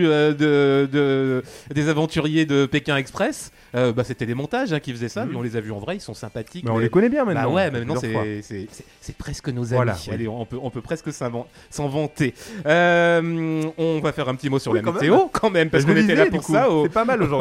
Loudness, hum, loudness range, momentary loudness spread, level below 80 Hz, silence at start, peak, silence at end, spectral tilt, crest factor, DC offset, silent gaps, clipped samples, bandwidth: -21 LUFS; none; 8 LU; 13 LU; -50 dBFS; 0 s; -2 dBFS; 0 s; -6 dB/octave; 20 dB; under 0.1%; none; under 0.1%; 15 kHz